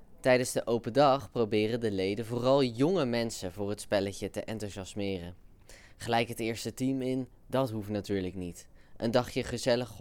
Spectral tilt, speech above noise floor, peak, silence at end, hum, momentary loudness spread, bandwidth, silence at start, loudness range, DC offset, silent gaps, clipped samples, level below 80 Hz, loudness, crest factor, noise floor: -5.5 dB/octave; 23 dB; -12 dBFS; 0 s; none; 12 LU; 17.5 kHz; 0 s; 6 LU; under 0.1%; none; under 0.1%; -56 dBFS; -31 LUFS; 20 dB; -53 dBFS